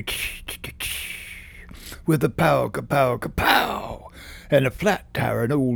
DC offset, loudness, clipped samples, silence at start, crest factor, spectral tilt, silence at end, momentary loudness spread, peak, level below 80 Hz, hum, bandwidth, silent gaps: under 0.1%; -23 LUFS; under 0.1%; 0 s; 22 dB; -5 dB/octave; 0 s; 20 LU; 0 dBFS; -42 dBFS; none; over 20 kHz; none